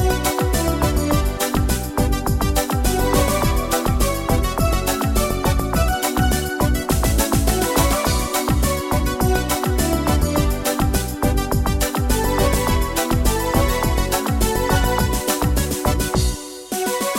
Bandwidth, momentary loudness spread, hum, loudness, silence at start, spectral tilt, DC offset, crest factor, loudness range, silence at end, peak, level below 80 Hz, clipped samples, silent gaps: 16.5 kHz; 3 LU; none; -19 LUFS; 0 s; -4.5 dB/octave; under 0.1%; 16 dB; 1 LU; 0 s; -2 dBFS; -22 dBFS; under 0.1%; none